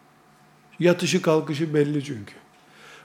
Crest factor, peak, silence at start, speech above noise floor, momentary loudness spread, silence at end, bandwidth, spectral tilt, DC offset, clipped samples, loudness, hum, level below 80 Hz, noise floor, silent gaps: 20 dB; -6 dBFS; 0.8 s; 33 dB; 15 LU; 0.1 s; 16.5 kHz; -5.5 dB/octave; under 0.1%; under 0.1%; -23 LUFS; none; -74 dBFS; -55 dBFS; none